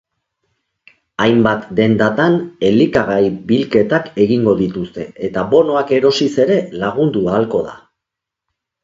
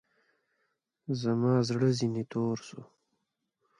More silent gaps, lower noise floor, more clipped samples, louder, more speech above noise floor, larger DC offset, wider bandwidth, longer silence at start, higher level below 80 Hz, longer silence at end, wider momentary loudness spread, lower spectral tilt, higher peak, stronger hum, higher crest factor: neither; about the same, -82 dBFS vs -81 dBFS; neither; first, -15 LUFS vs -30 LUFS; first, 68 dB vs 52 dB; neither; second, 7.8 kHz vs 10.5 kHz; about the same, 1.2 s vs 1.1 s; first, -48 dBFS vs -72 dBFS; about the same, 1.05 s vs 0.95 s; second, 8 LU vs 20 LU; about the same, -7 dB/octave vs -7 dB/octave; first, 0 dBFS vs -14 dBFS; neither; about the same, 16 dB vs 18 dB